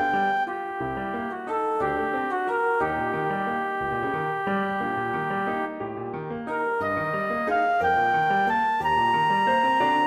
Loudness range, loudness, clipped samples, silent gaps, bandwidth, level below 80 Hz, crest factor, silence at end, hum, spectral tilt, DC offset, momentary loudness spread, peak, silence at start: 5 LU; -25 LUFS; under 0.1%; none; 14.5 kHz; -56 dBFS; 12 dB; 0 s; none; -6 dB/octave; under 0.1%; 9 LU; -12 dBFS; 0 s